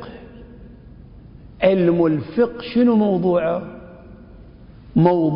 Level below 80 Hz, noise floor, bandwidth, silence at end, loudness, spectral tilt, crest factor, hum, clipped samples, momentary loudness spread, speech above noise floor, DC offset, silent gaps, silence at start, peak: -46 dBFS; -42 dBFS; 5.4 kHz; 0 s; -18 LUFS; -12.5 dB/octave; 18 dB; none; under 0.1%; 21 LU; 25 dB; under 0.1%; none; 0 s; -2 dBFS